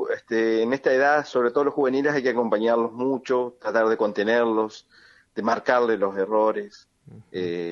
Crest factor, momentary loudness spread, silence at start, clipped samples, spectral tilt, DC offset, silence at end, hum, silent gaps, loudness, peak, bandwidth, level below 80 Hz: 18 dB; 8 LU; 0 s; under 0.1%; -5.5 dB/octave; under 0.1%; 0 s; none; none; -23 LUFS; -6 dBFS; 7.2 kHz; -72 dBFS